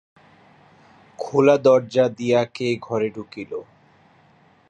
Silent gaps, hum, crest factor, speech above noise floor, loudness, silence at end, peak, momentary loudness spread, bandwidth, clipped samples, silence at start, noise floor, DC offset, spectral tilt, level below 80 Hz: none; none; 20 dB; 36 dB; -20 LUFS; 1.05 s; -4 dBFS; 18 LU; 9 kHz; under 0.1%; 1.2 s; -56 dBFS; under 0.1%; -6.5 dB/octave; -66 dBFS